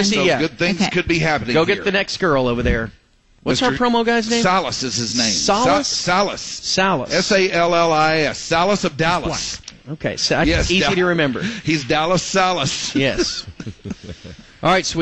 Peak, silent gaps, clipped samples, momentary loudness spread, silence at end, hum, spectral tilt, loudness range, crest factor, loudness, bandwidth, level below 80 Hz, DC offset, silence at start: -4 dBFS; none; under 0.1%; 11 LU; 0 s; none; -3.5 dB/octave; 2 LU; 14 dB; -17 LUFS; 8.8 kHz; -36 dBFS; 0.4%; 0 s